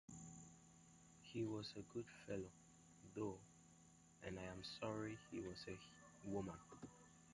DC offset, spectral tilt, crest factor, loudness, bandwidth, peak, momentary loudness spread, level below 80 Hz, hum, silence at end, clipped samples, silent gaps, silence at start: under 0.1%; -5 dB/octave; 20 dB; -52 LUFS; 11 kHz; -32 dBFS; 19 LU; -74 dBFS; none; 0 s; under 0.1%; none; 0.1 s